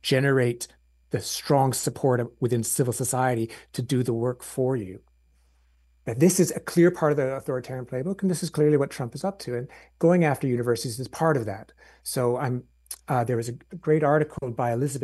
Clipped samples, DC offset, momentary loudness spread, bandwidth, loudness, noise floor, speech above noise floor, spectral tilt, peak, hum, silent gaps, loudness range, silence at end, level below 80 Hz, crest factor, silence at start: under 0.1%; under 0.1%; 13 LU; 13 kHz; -25 LUFS; -62 dBFS; 37 dB; -5.5 dB/octave; -8 dBFS; none; none; 3 LU; 0 s; -60 dBFS; 18 dB; 0.05 s